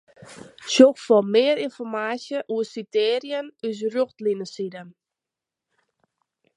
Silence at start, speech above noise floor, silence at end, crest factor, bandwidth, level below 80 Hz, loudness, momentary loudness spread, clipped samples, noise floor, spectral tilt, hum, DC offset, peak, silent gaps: 0.3 s; 66 dB; 1.65 s; 22 dB; 11 kHz; -76 dBFS; -22 LUFS; 16 LU; under 0.1%; -88 dBFS; -4 dB/octave; none; under 0.1%; 0 dBFS; none